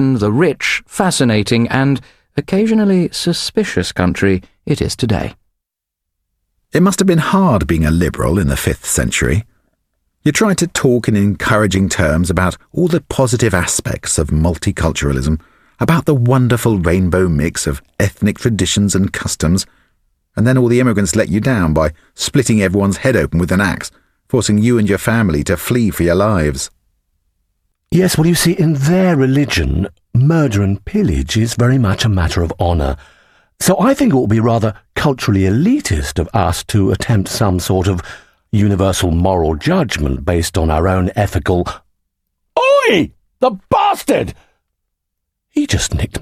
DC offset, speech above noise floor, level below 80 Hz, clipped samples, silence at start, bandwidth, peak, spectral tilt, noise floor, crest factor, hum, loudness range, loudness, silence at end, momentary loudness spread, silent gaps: under 0.1%; 66 dB; -30 dBFS; under 0.1%; 0 s; 16 kHz; 0 dBFS; -5.5 dB/octave; -79 dBFS; 14 dB; none; 2 LU; -15 LUFS; 0 s; 6 LU; none